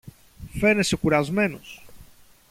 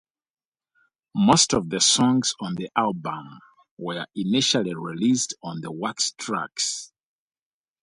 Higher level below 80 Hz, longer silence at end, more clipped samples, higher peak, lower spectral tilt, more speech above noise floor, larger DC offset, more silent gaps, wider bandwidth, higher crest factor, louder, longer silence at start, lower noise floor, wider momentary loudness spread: first, -46 dBFS vs -62 dBFS; second, 0.5 s vs 0.95 s; neither; second, -8 dBFS vs -4 dBFS; first, -5 dB/octave vs -3 dB/octave; second, 28 dB vs 45 dB; neither; second, none vs 3.71-3.77 s; first, 16 kHz vs 11.5 kHz; about the same, 18 dB vs 22 dB; about the same, -22 LUFS vs -23 LUFS; second, 0.05 s vs 1.15 s; second, -50 dBFS vs -68 dBFS; first, 19 LU vs 15 LU